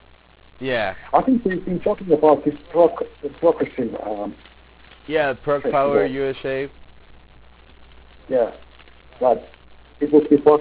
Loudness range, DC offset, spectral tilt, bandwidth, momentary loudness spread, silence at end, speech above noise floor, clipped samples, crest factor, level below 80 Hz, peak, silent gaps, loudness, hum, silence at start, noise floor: 7 LU; under 0.1%; -10.5 dB/octave; 4 kHz; 12 LU; 0 s; 28 dB; under 0.1%; 18 dB; -50 dBFS; -2 dBFS; none; -20 LUFS; none; 0.6 s; -47 dBFS